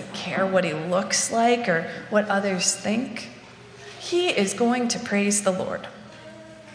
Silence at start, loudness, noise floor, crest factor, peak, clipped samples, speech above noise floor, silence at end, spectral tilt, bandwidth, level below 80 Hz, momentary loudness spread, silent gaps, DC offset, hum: 0 s; -23 LUFS; -45 dBFS; 20 dB; -6 dBFS; under 0.1%; 21 dB; 0 s; -3.5 dB/octave; 10.5 kHz; -66 dBFS; 21 LU; none; under 0.1%; none